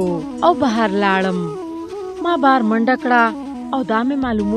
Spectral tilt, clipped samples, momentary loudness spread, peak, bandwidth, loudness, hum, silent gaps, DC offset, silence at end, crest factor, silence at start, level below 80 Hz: -6.5 dB/octave; under 0.1%; 13 LU; -2 dBFS; 10.5 kHz; -17 LUFS; none; none; under 0.1%; 0 s; 16 dB; 0 s; -46 dBFS